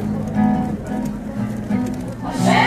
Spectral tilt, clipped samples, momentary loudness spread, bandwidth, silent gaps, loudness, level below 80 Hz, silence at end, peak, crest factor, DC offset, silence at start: -6 dB/octave; under 0.1%; 8 LU; 14.5 kHz; none; -22 LUFS; -38 dBFS; 0 s; -2 dBFS; 18 dB; under 0.1%; 0 s